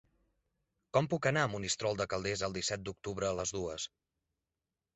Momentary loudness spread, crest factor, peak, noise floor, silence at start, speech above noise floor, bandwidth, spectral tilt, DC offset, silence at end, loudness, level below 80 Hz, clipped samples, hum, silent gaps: 9 LU; 22 dB; -14 dBFS; under -90 dBFS; 0.95 s; over 55 dB; 8.2 kHz; -4 dB/octave; under 0.1%; 1.1 s; -35 LUFS; -60 dBFS; under 0.1%; none; none